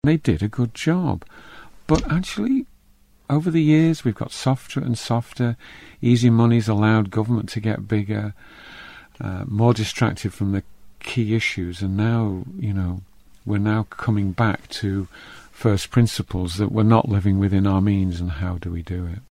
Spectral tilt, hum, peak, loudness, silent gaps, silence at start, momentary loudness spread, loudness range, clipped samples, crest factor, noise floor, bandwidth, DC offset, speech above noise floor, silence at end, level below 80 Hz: -7 dB/octave; none; -4 dBFS; -22 LUFS; none; 0.05 s; 13 LU; 4 LU; under 0.1%; 18 dB; -55 dBFS; 13 kHz; under 0.1%; 34 dB; 0.1 s; -42 dBFS